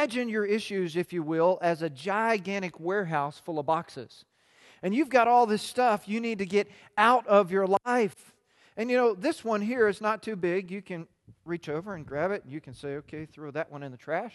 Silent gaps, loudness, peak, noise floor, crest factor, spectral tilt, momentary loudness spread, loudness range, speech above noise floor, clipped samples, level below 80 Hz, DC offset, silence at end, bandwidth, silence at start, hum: none; -28 LUFS; -6 dBFS; -59 dBFS; 22 dB; -5.5 dB/octave; 16 LU; 9 LU; 31 dB; under 0.1%; -70 dBFS; under 0.1%; 0.05 s; 12.5 kHz; 0 s; none